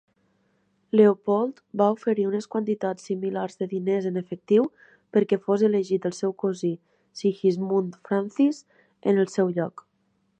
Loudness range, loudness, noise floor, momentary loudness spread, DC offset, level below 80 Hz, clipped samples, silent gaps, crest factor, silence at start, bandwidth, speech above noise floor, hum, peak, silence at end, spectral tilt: 2 LU; -25 LUFS; -70 dBFS; 8 LU; under 0.1%; -76 dBFS; under 0.1%; none; 20 dB; 0.95 s; 9 kHz; 46 dB; none; -6 dBFS; 0.7 s; -7.5 dB/octave